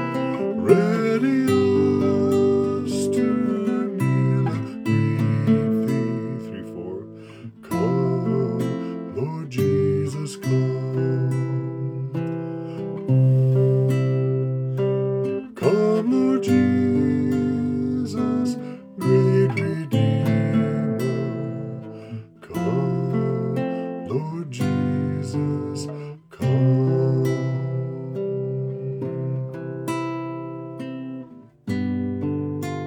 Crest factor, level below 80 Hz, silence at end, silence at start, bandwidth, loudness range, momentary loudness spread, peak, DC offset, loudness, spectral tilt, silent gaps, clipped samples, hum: 20 dB; -66 dBFS; 0 s; 0 s; 14.5 kHz; 6 LU; 13 LU; -2 dBFS; under 0.1%; -23 LUFS; -8.5 dB/octave; none; under 0.1%; none